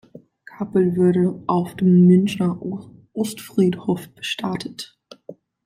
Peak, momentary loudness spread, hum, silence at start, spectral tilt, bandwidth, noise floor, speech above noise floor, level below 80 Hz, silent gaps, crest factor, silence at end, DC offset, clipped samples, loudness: -4 dBFS; 18 LU; none; 0.6 s; -7.5 dB/octave; 14.5 kHz; -45 dBFS; 26 dB; -60 dBFS; none; 16 dB; 0.35 s; under 0.1%; under 0.1%; -20 LUFS